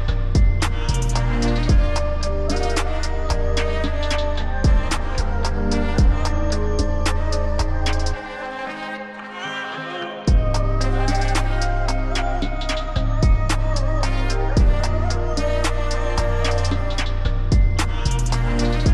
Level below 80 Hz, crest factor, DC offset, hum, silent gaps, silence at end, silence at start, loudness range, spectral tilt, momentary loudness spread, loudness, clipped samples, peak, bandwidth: -20 dBFS; 12 dB; under 0.1%; none; none; 0 s; 0 s; 3 LU; -5.5 dB/octave; 7 LU; -22 LUFS; under 0.1%; -6 dBFS; 11.5 kHz